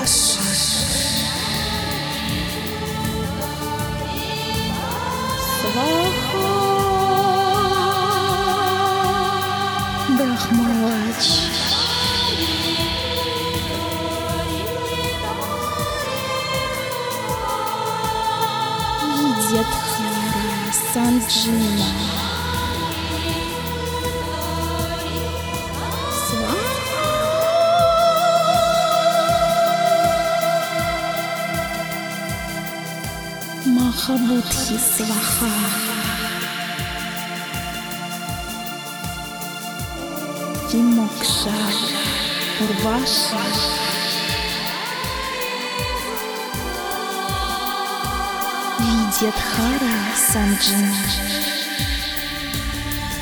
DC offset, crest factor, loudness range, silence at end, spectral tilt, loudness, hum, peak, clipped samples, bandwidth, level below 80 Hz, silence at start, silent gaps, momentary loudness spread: under 0.1%; 16 dB; 6 LU; 0 s; -3.5 dB/octave; -20 LUFS; none; -4 dBFS; under 0.1%; over 20 kHz; -38 dBFS; 0 s; none; 9 LU